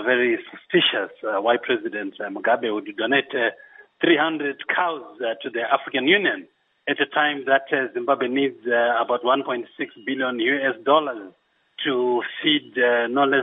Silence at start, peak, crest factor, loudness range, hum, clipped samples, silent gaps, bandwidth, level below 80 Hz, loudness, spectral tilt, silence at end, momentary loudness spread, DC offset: 0 s; -4 dBFS; 18 dB; 2 LU; none; under 0.1%; none; 3.9 kHz; -80 dBFS; -22 LUFS; -8.5 dB/octave; 0 s; 9 LU; under 0.1%